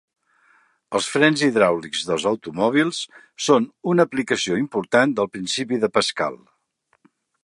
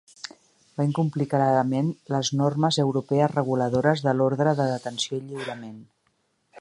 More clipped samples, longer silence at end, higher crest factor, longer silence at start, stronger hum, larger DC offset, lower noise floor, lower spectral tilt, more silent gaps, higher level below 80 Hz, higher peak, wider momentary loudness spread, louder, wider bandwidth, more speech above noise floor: neither; first, 1.1 s vs 0 s; about the same, 20 dB vs 20 dB; first, 0.9 s vs 0.25 s; neither; neither; about the same, -68 dBFS vs -70 dBFS; second, -4 dB/octave vs -6 dB/octave; neither; about the same, -64 dBFS vs -66 dBFS; first, 0 dBFS vs -6 dBFS; second, 8 LU vs 15 LU; first, -21 LUFS vs -24 LUFS; about the same, 11.5 kHz vs 11 kHz; about the same, 47 dB vs 47 dB